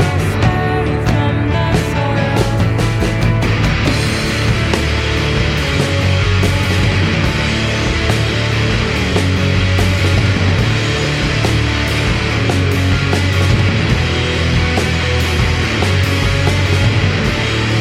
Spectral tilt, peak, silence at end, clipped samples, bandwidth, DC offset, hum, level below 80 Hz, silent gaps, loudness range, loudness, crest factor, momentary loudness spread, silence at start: -5.5 dB/octave; -2 dBFS; 0 s; under 0.1%; 14.5 kHz; under 0.1%; none; -24 dBFS; none; 1 LU; -14 LUFS; 12 dB; 2 LU; 0 s